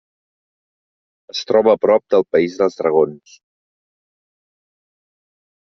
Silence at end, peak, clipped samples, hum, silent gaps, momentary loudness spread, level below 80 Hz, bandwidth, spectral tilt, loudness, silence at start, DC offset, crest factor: 2.6 s; -2 dBFS; under 0.1%; none; none; 8 LU; -62 dBFS; 7 kHz; -4 dB/octave; -16 LUFS; 1.35 s; under 0.1%; 18 dB